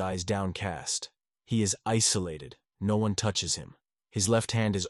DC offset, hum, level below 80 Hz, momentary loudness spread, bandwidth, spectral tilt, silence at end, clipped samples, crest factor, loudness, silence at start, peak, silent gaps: under 0.1%; none; -56 dBFS; 12 LU; 11.5 kHz; -4 dB/octave; 0 s; under 0.1%; 16 dB; -29 LUFS; 0 s; -14 dBFS; none